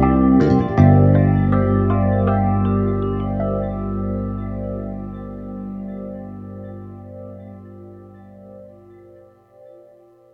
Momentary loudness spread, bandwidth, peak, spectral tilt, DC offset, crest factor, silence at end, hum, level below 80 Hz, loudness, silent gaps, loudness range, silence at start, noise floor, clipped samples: 22 LU; 5.8 kHz; -2 dBFS; -11 dB/octave; under 0.1%; 18 dB; 1.65 s; 50 Hz at -45 dBFS; -34 dBFS; -18 LUFS; none; 22 LU; 0 s; -49 dBFS; under 0.1%